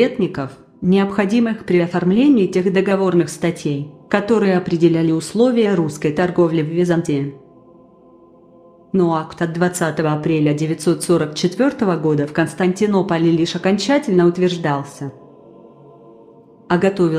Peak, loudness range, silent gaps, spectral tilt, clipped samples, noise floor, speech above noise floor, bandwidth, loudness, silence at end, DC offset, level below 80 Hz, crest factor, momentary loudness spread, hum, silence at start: -2 dBFS; 4 LU; none; -6.5 dB/octave; under 0.1%; -47 dBFS; 31 dB; 13.5 kHz; -17 LUFS; 0 s; under 0.1%; -56 dBFS; 16 dB; 7 LU; none; 0 s